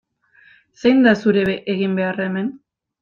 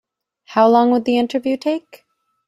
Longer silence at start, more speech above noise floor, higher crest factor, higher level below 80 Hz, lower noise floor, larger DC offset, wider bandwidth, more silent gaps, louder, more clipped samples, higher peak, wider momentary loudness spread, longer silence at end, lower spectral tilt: first, 0.85 s vs 0.5 s; first, 36 dB vs 31 dB; about the same, 16 dB vs 16 dB; first, -58 dBFS vs -64 dBFS; first, -53 dBFS vs -47 dBFS; neither; second, 7.2 kHz vs 12 kHz; neither; about the same, -18 LUFS vs -17 LUFS; neither; about the same, -2 dBFS vs -2 dBFS; about the same, 10 LU vs 10 LU; second, 0.45 s vs 0.7 s; first, -7.5 dB/octave vs -6 dB/octave